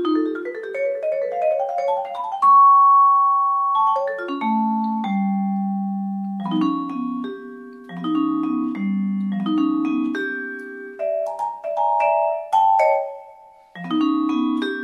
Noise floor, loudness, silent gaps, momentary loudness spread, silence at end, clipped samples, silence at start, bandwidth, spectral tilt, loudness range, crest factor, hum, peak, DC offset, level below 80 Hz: -46 dBFS; -20 LUFS; none; 14 LU; 0 s; under 0.1%; 0 s; 8.6 kHz; -7.5 dB/octave; 8 LU; 14 dB; none; -6 dBFS; under 0.1%; -76 dBFS